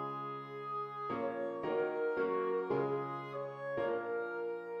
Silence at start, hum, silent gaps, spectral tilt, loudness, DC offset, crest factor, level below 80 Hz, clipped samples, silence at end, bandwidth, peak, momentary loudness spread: 0 s; none; none; -8 dB/octave; -38 LUFS; under 0.1%; 14 dB; -78 dBFS; under 0.1%; 0 s; 5.8 kHz; -24 dBFS; 7 LU